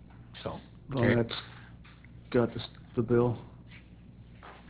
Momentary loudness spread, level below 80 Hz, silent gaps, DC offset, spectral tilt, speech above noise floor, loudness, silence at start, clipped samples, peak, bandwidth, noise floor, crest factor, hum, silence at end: 25 LU; -54 dBFS; none; under 0.1%; -6 dB/octave; 23 dB; -31 LUFS; 0.15 s; under 0.1%; -10 dBFS; 4 kHz; -52 dBFS; 22 dB; 60 Hz at -50 dBFS; 0 s